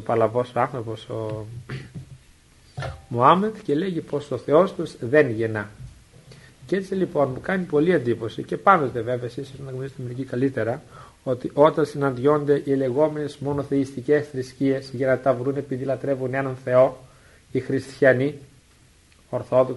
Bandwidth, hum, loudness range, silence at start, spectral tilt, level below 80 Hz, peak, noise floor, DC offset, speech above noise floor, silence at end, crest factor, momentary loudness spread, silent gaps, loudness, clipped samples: 11.5 kHz; none; 3 LU; 0 s; -7.5 dB/octave; -56 dBFS; 0 dBFS; -55 dBFS; under 0.1%; 33 dB; 0 s; 22 dB; 15 LU; none; -23 LUFS; under 0.1%